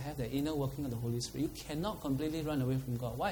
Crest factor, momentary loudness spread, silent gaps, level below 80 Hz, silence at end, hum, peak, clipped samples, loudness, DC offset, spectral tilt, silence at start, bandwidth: 16 dB; 4 LU; none; -52 dBFS; 0 s; none; -20 dBFS; under 0.1%; -37 LUFS; under 0.1%; -6 dB/octave; 0 s; over 20 kHz